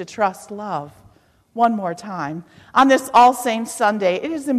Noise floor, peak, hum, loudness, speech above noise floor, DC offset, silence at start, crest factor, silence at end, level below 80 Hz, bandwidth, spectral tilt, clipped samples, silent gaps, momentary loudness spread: -54 dBFS; -4 dBFS; none; -18 LUFS; 35 dB; under 0.1%; 0 s; 16 dB; 0 s; -60 dBFS; 14 kHz; -4 dB/octave; under 0.1%; none; 16 LU